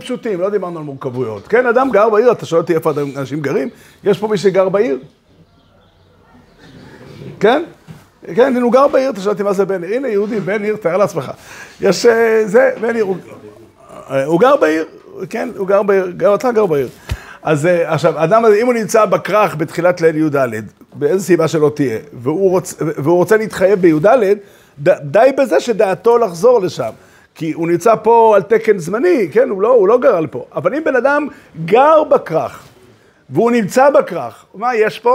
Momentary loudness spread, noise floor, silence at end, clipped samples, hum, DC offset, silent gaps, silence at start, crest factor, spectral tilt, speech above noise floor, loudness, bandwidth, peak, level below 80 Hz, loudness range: 12 LU; -50 dBFS; 0 s; under 0.1%; none; under 0.1%; none; 0 s; 14 dB; -6 dB/octave; 36 dB; -14 LUFS; 16 kHz; 0 dBFS; -48 dBFS; 5 LU